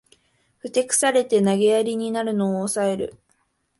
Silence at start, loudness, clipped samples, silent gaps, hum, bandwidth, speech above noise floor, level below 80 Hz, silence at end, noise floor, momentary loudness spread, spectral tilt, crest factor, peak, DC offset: 0.65 s; -21 LUFS; under 0.1%; none; none; 12 kHz; 47 dB; -64 dBFS; 0.7 s; -68 dBFS; 9 LU; -4 dB/octave; 16 dB; -6 dBFS; under 0.1%